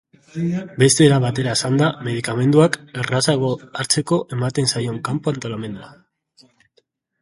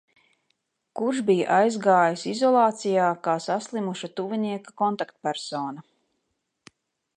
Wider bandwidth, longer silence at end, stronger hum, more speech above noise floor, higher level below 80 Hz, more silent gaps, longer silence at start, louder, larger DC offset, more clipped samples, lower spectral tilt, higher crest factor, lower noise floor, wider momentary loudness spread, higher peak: about the same, 11.5 kHz vs 10.5 kHz; about the same, 1.3 s vs 1.35 s; neither; second, 45 dB vs 54 dB; first, -56 dBFS vs -80 dBFS; neither; second, 0.35 s vs 0.95 s; first, -19 LUFS vs -24 LUFS; neither; neither; about the same, -5 dB/octave vs -5 dB/octave; about the same, 20 dB vs 20 dB; second, -64 dBFS vs -77 dBFS; about the same, 12 LU vs 11 LU; first, 0 dBFS vs -6 dBFS